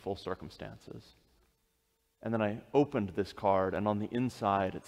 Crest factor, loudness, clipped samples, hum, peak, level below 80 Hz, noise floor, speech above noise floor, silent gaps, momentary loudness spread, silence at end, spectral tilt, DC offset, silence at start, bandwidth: 20 dB; -33 LUFS; under 0.1%; none; -14 dBFS; -64 dBFS; -77 dBFS; 44 dB; none; 17 LU; 0 s; -7.5 dB/octave; under 0.1%; 0.05 s; 15 kHz